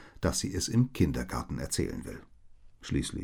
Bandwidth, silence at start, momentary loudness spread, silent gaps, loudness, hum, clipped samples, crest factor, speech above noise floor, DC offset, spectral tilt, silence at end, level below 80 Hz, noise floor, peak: 18.5 kHz; 0 s; 15 LU; none; -31 LUFS; none; under 0.1%; 18 dB; 22 dB; under 0.1%; -5 dB/octave; 0 s; -44 dBFS; -53 dBFS; -14 dBFS